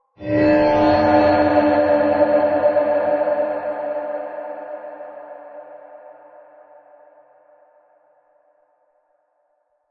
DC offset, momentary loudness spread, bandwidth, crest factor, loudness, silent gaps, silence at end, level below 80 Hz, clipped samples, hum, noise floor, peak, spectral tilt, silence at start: under 0.1%; 23 LU; 5.8 kHz; 18 dB; -17 LUFS; none; 3.8 s; -52 dBFS; under 0.1%; none; -67 dBFS; -4 dBFS; -8 dB/octave; 0.2 s